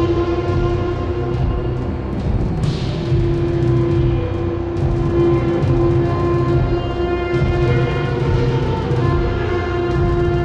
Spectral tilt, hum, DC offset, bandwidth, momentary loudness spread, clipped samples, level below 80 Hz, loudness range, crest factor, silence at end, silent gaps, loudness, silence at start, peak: -8.5 dB/octave; none; under 0.1%; 7.8 kHz; 5 LU; under 0.1%; -26 dBFS; 3 LU; 14 dB; 0 s; none; -18 LUFS; 0 s; -4 dBFS